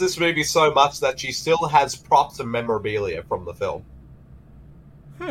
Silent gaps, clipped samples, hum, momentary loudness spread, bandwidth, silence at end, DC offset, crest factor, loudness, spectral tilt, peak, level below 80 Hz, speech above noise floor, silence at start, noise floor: none; under 0.1%; none; 11 LU; 16.5 kHz; 0 s; under 0.1%; 18 dB; -21 LUFS; -3.5 dB/octave; -4 dBFS; -50 dBFS; 25 dB; 0 s; -46 dBFS